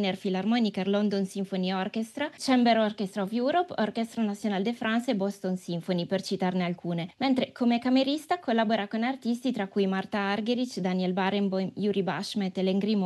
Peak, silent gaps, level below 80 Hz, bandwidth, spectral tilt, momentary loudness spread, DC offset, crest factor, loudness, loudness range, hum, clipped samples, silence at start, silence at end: -10 dBFS; none; -76 dBFS; 12.5 kHz; -6 dB/octave; 5 LU; under 0.1%; 16 dB; -28 LUFS; 2 LU; none; under 0.1%; 0 s; 0 s